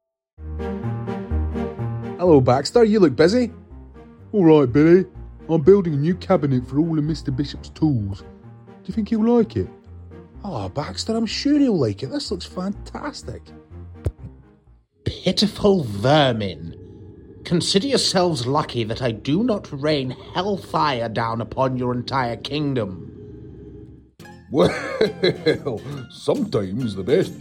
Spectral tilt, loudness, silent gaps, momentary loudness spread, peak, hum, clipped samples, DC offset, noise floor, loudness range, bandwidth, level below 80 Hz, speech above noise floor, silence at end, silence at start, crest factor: -6 dB/octave; -21 LUFS; none; 18 LU; -2 dBFS; none; under 0.1%; under 0.1%; -54 dBFS; 7 LU; 15.5 kHz; -40 dBFS; 35 dB; 0 s; 0.4 s; 20 dB